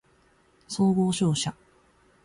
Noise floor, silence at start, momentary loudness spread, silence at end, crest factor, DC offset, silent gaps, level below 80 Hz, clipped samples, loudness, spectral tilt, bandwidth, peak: -62 dBFS; 0.7 s; 10 LU; 0.7 s; 14 dB; under 0.1%; none; -60 dBFS; under 0.1%; -26 LUFS; -5.5 dB/octave; 11.5 kHz; -14 dBFS